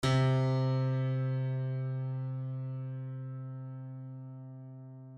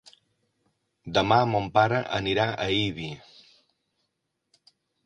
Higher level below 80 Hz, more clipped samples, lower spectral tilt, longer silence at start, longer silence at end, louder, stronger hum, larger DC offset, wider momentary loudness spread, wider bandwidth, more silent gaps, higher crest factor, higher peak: second, -62 dBFS vs -56 dBFS; neither; first, -7.5 dB/octave vs -5.5 dB/octave; second, 0 s vs 1.05 s; second, 0 s vs 1.85 s; second, -34 LUFS vs -25 LUFS; neither; neither; first, 18 LU vs 15 LU; about the same, 9.6 kHz vs 9.8 kHz; neither; second, 16 dB vs 22 dB; second, -18 dBFS vs -6 dBFS